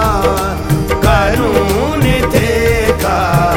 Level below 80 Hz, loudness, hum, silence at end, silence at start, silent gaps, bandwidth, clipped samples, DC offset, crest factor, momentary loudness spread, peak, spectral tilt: -20 dBFS; -13 LUFS; none; 0 s; 0 s; none; 17.5 kHz; under 0.1%; under 0.1%; 12 dB; 3 LU; 0 dBFS; -5.5 dB/octave